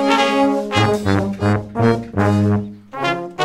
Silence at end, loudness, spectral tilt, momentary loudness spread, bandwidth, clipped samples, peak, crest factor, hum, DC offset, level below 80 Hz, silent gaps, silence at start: 0 s; -18 LUFS; -6.5 dB/octave; 6 LU; 13 kHz; under 0.1%; 0 dBFS; 16 dB; none; under 0.1%; -48 dBFS; none; 0 s